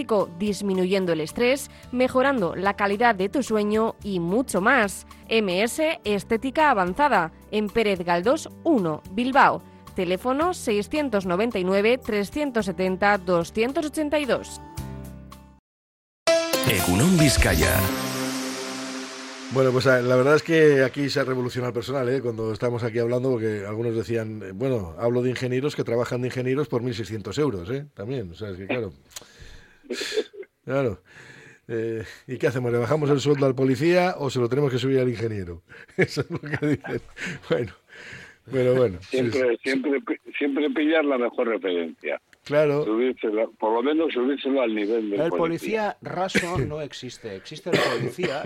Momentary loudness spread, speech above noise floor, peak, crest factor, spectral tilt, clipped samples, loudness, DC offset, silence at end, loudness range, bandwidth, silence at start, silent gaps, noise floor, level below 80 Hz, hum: 13 LU; 23 dB; -4 dBFS; 18 dB; -5.5 dB/octave; under 0.1%; -24 LUFS; under 0.1%; 0 s; 6 LU; 16.5 kHz; 0 s; 15.59-16.26 s; -46 dBFS; -44 dBFS; none